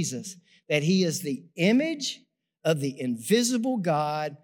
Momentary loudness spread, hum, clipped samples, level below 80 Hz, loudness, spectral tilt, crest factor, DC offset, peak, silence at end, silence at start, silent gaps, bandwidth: 10 LU; none; under 0.1%; -86 dBFS; -26 LUFS; -4.5 dB/octave; 18 dB; under 0.1%; -8 dBFS; 0.05 s; 0 s; none; 19 kHz